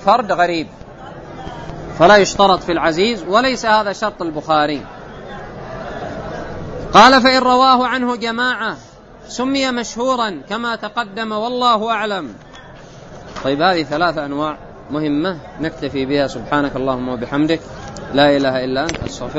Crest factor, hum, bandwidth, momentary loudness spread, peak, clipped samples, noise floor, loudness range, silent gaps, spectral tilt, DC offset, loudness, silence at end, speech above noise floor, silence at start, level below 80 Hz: 16 dB; none; 8.8 kHz; 20 LU; 0 dBFS; under 0.1%; -37 dBFS; 7 LU; none; -4.5 dB/octave; under 0.1%; -16 LUFS; 0 s; 22 dB; 0 s; -42 dBFS